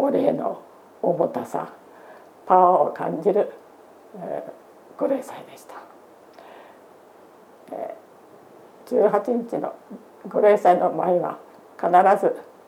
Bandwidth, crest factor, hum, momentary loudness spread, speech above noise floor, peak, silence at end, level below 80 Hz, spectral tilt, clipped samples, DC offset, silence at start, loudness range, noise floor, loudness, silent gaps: 15.5 kHz; 22 dB; none; 24 LU; 28 dB; -2 dBFS; 0.25 s; -82 dBFS; -7 dB/octave; under 0.1%; under 0.1%; 0 s; 13 LU; -49 dBFS; -21 LUFS; none